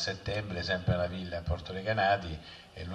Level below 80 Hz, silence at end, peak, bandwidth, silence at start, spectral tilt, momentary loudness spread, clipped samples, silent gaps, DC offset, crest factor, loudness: -48 dBFS; 0 s; -16 dBFS; 10.5 kHz; 0 s; -5.5 dB/octave; 15 LU; under 0.1%; none; under 0.1%; 16 dB; -32 LUFS